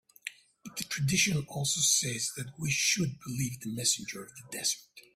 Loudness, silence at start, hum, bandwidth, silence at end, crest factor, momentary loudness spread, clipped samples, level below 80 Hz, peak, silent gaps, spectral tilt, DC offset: -29 LUFS; 0.25 s; none; 16 kHz; 0.15 s; 20 dB; 16 LU; under 0.1%; -64 dBFS; -12 dBFS; none; -2 dB/octave; under 0.1%